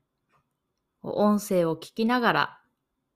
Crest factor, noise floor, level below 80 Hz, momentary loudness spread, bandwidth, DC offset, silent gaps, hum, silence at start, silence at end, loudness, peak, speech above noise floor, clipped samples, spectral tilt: 20 dB; -80 dBFS; -66 dBFS; 10 LU; 15.5 kHz; under 0.1%; none; none; 1.05 s; 0.6 s; -25 LUFS; -8 dBFS; 55 dB; under 0.1%; -5.5 dB/octave